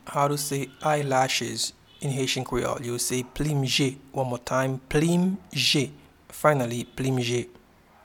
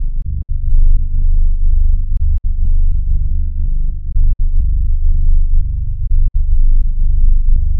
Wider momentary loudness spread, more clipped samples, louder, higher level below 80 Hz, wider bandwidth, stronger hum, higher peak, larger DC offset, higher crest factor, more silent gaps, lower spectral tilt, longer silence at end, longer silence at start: first, 8 LU vs 5 LU; neither; second, -26 LUFS vs -19 LUFS; second, -50 dBFS vs -10 dBFS; first, 18.5 kHz vs 0.4 kHz; neither; about the same, -4 dBFS vs -2 dBFS; neither; first, 22 dB vs 8 dB; neither; second, -4.5 dB/octave vs -17 dB/octave; first, 0.55 s vs 0 s; about the same, 0.05 s vs 0 s